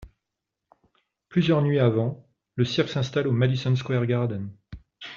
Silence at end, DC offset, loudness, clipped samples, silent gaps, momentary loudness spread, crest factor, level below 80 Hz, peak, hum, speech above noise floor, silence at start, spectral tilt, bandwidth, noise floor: 0 s; under 0.1%; -24 LUFS; under 0.1%; none; 15 LU; 18 dB; -56 dBFS; -8 dBFS; none; 62 dB; 0 s; -6.5 dB/octave; 7.2 kHz; -85 dBFS